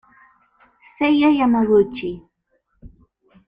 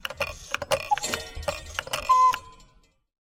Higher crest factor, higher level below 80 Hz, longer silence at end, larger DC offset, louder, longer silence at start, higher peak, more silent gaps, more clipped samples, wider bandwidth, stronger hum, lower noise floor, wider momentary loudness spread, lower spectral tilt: second, 16 dB vs 22 dB; about the same, -52 dBFS vs -48 dBFS; about the same, 0.6 s vs 0.7 s; neither; first, -18 LUFS vs -26 LUFS; first, 1 s vs 0.05 s; about the same, -6 dBFS vs -6 dBFS; neither; neither; second, 5.2 kHz vs 16.5 kHz; neither; first, -68 dBFS vs -60 dBFS; about the same, 15 LU vs 13 LU; first, -8.5 dB/octave vs -1.5 dB/octave